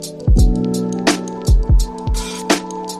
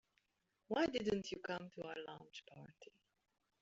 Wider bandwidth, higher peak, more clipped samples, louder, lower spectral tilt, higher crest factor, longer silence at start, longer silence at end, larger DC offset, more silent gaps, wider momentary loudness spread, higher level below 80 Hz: first, 14.5 kHz vs 7.6 kHz; first, 0 dBFS vs -24 dBFS; neither; first, -18 LUFS vs -43 LUFS; first, -5 dB/octave vs -3.5 dB/octave; second, 14 dB vs 22 dB; second, 0 s vs 0.7 s; second, 0 s vs 0.75 s; neither; neither; second, 7 LU vs 21 LU; first, -18 dBFS vs -76 dBFS